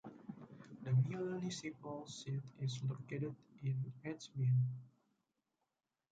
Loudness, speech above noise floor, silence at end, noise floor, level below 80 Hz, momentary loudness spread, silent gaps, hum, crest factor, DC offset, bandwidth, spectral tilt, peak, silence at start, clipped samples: -41 LUFS; 48 dB; 1.25 s; -90 dBFS; -78 dBFS; 17 LU; none; none; 16 dB; under 0.1%; 8 kHz; -6.5 dB/octave; -24 dBFS; 0.05 s; under 0.1%